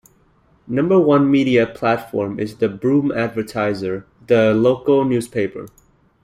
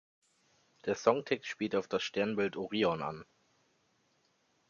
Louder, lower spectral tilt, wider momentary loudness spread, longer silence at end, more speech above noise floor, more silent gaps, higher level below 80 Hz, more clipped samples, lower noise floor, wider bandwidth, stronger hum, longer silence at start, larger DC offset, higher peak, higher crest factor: first, -18 LUFS vs -34 LUFS; first, -7.5 dB/octave vs -5 dB/octave; about the same, 11 LU vs 9 LU; second, 0.55 s vs 1.45 s; about the same, 39 dB vs 41 dB; neither; first, -54 dBFS vs -72 dBFS; neither; second, -56 dBFS vs -74 dBFS; first, 14.5 kHz vs 7.4 kHz; neither; second, 0.7 s vs 0.85 s; neither; first, -2 dBFS vs -12 dBFS; second, 16 dB vs 24 dB